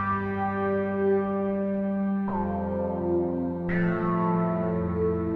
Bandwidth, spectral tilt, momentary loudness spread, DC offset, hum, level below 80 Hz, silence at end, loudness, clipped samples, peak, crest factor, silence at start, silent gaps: 4.2 kHz; -11 dB/octave; 4 LU; under 0.1%; none; -50 dBFS; 0 s; -27 LUFS; under 0.1%; -14 dBFS; 12 dB; 0 s; none